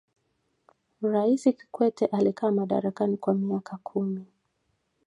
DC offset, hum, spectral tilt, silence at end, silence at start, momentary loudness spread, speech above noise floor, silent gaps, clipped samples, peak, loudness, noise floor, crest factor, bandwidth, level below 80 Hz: under 0.1%; none; -8 dB/octave; 0.8 s; 1 s; 9 LU; 49 dB; none; under 0.1%; -8 dBFS; -27 LUFS; -75 dBFS; 18 dB; 11 kHz; -74 dBFS